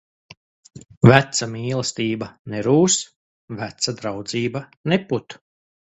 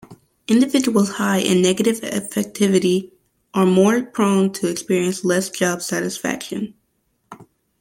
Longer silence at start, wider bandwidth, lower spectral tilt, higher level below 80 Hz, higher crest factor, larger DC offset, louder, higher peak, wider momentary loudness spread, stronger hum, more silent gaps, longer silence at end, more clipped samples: first, 0.75 s vs 0.1 s; second, 8.2 kHz vs 16.5 kHz; about the same, -4.5 dB/octave vs -5 dB/octave; first, -54 dBFS vs -62 dBFS; first, 22 dB vs 16 dB; neither; about the same, -20 LUFS vs -19 LUFS; about the same, 0 dBFS vs -2 dBFS; first, 17 LU vs 9 LU; neither; first, 0.97-1.01 s, 2.39-2.45 s, 3.16-3.48 s, 4.77-4.84 s vs none; first, 0.6 s vs 0.35 s; neither